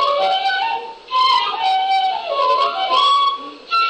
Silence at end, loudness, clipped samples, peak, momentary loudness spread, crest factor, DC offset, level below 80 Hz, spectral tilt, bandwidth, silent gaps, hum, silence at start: 0 s; -17 LUFS; under 0.1%; -6 dBFS; 7 LU; 12 dB; under 0.1%; -64 dBFS; -0.5 dB/octave; 9 kHz; none; none; 0 s